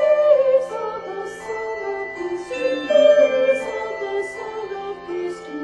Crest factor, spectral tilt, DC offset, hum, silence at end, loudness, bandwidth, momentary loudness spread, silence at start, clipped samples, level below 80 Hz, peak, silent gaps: 16 dB; -4 dB/octave; under 0.1%; none; 0 s; -21 LUFS; 10.5 kHz; 15 LU; 0 s; under 0.1%; -60 dBFS; -4 dBFS; none